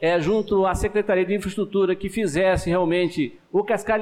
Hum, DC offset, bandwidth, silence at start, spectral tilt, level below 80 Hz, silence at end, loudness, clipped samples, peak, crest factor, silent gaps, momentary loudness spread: none; under 0.1%; 14.5 kHz; 0 s; -6 dB/octave; -40 dBFS; 0 s; -22 LUFS; under 0.1%; -12 dBFS; 10 dB; none; 5 LU